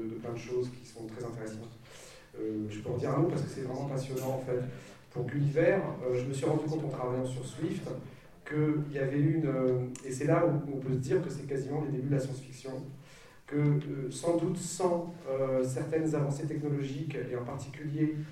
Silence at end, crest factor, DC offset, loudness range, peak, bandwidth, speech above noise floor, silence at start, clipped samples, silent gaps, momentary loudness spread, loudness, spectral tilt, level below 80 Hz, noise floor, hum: 0 s; 18 dB; under 0.1%; 4 LU; -14 dBFS; 14 kHz; 21 dB; 0 s; under 0.1%; none; 13 LU; -33 LUFS; -7 dB/octave; -62 dBFS; -53 dBFS; none